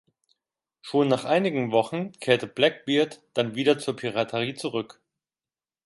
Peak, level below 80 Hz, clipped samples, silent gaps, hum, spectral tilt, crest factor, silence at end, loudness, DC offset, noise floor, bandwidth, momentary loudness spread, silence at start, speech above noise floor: -4 dBFS; -72 dBFS; under 0.1%; none; none; -5.5 dB/octave; 22 dB; 1 s; -25 LUFS; under 0.1%; under -90 dBFS; 11.5 kHz; 8 LU; 0.85 s; over 65 dB